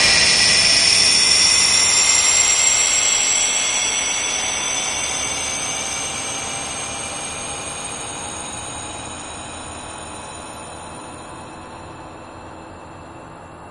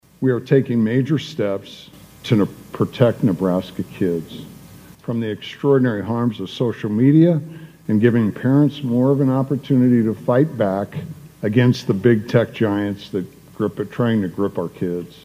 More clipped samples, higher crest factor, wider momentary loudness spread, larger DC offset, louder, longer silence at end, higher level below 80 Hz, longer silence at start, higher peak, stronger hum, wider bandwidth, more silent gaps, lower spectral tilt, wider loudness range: neither; about the same, 18 dB vs 18 dB; first, 24 LU vs 12 LU; neither; first, -15 LUFS vs -19 LUFS; second, 0 s vs 0.2 s; first, -48 dBFS vs -58 dBFS; second, 0 s vs 0.2 s; about the same, -2 dBFS vs 0 dBFS; neither; second, 12 kHz vs 15.5 kHz; neither; second, 0.5 dB/octave vs -8.5 dB/octave; first, 21 LU vs 4 LU